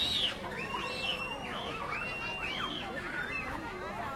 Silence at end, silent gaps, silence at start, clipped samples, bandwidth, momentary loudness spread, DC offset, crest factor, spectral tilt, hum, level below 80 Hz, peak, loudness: 0 s; none; 0 s; under 0.1%; 16.5 kHz; 6 LU; under 0.1%; 16 dB; -3 dB/octave; none; -54 dBFS; -20 dBFS; -35 LUFS